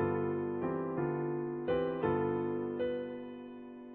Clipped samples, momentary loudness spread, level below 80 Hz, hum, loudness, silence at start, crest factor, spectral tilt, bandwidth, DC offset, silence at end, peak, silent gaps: under 0.1%; 13 LU; -64 dBFS; none; -35 LUFS; 0 s; 16 dB; -7 dB/octave; 4.3 kHz; under 0.1%; 0 s; -20 dBFS; none